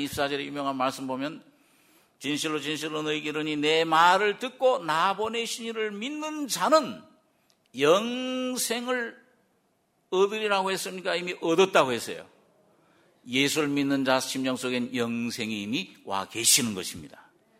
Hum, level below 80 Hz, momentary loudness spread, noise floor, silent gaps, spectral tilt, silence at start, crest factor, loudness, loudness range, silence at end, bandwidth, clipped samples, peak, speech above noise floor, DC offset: none; -68 dBFS; 12 LU; -70 dBFS; none; -2.5 dB/octave; 0 s; 22 dB; -26 LUFS; 4 LU; 0.5 s; 16 kHz; under 0.1%; -6 dBFS; 44 dB; under 0.1%